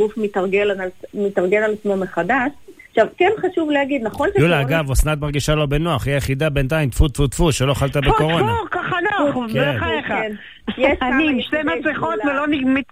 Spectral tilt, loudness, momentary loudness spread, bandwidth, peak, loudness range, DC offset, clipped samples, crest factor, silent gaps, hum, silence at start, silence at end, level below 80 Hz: -5.5 dB/octave; -19 LUFS; 5 LU; 16 kHz; -4 dBFS; 1 LU; 0.3%; under 0.1%; 16 dB; none; none; 0 s; 0.1 s; -30 dBFS